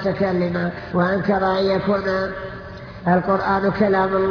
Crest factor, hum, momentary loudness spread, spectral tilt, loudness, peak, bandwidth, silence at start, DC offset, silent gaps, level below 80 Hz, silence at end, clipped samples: 14 dB; none; 9 LU; -8.5 dB/octave; -20 LUFS; -6 dBFS; 5.4 kHz; 0 s; under 0.1%; none; -44 dBFS; 0 s; under 0.1%